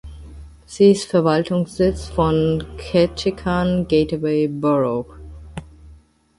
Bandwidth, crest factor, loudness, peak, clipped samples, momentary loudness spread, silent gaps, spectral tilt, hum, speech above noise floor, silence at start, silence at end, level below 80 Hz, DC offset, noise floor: 11.5 kHz; 18 dB; -19 LUFS; -2 dBFS; under 0.1%; 21 LU; none; -7 dB/octave; none; 30 dB; 0.05 s; 0.45 s; -38 dBFS; under 0.1%; -48 dBFS